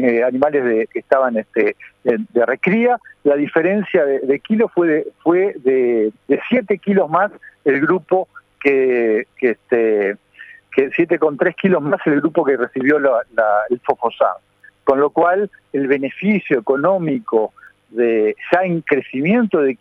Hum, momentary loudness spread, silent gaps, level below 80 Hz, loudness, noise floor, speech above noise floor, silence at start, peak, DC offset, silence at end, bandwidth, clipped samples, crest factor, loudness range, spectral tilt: none; 5 LU; none; -64 dBFS; -17 LUFS; -40 dBFS; 24 dB; 0 s; 0 dBFS; under 0.1%; 0.05 s; 4.9 kHz; under 0.1%; 16 dB; 1 LU; -9 dB/octave